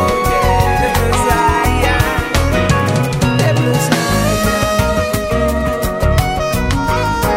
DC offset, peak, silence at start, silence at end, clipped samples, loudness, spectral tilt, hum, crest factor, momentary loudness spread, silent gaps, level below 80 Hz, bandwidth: under 0.1%; 0 dBFS; 0 s; 0 s; under 0.1%; -14 LUFS; -5 dB/octave; none; 14 dB; 3 LU; none; -22 dBFS; 16.5 kHz